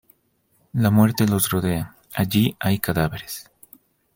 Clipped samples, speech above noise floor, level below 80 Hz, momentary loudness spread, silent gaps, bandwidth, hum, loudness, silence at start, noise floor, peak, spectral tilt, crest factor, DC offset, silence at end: under 0.1%; 45 dB; -50 dBFS; 14 LU; none; 17 kHz; none; -21 LUFS; 0.75 s; -65 dBFS; -2 dBFS; -5.5 dB/octave; 20 dB; under 0.1%; 0.75 s